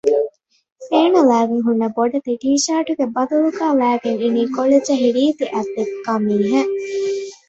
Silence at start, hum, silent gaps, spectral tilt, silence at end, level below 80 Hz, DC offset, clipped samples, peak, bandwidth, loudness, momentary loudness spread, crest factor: 0.05 s; none; 0.72-0.76 s; -4.5 dB/octave; 0.15 s; -64 dBFS; under 0.1%; under 0.1%; -2 dBFS; 8.2 kHz; -18 LUFS; 7 LU; 16 dB